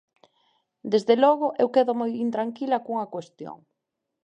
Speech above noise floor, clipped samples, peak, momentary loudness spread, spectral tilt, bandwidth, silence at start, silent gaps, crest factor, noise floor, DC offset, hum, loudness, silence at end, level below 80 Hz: 59 dB; under 0.1%; -6 dBFS; 21 LU; -6 dB/octave; 9.2 kHz; 0.85 s; none; 20 dB; -83 dBFS; under 0.1%; none; -24 LUFS; 0.7 s; -80 dBFS